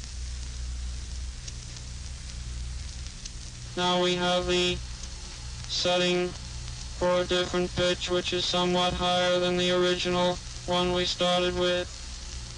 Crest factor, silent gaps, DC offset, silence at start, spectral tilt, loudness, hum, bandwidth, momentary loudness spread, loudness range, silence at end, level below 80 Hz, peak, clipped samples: 14 dB; none; under 0.1%; 0 s; -4 dB/octave; -27 LUFS; 60 Hz at -45 dBFS; 10.5 kHz; 15 LU; 9 LU; 0 s; -40 dBFS; -16 dBFS; under 0.1%